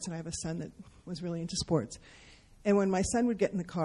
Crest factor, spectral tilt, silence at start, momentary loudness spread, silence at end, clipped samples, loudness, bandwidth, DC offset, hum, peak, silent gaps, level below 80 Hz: 18 dB; -5.5 dB/octave; 0 s; 16 LU; 0 s; under 0.1%; -32 LUFS; 12 kHz; under 0.1%; none; -14 dBFS; none; -54 dBFS